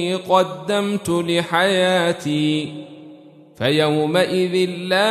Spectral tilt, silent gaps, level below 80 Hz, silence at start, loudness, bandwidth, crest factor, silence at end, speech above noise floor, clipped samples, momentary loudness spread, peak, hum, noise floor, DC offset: -5 dB/octave; none; -62 dBFS; 0 s; -19 LUFS; 13.5 kHz; 16 dB; 0 s; 25 dB; under 0.1%; 7 LU; -2 dBFS; none; -44 dBFS; under 0.1%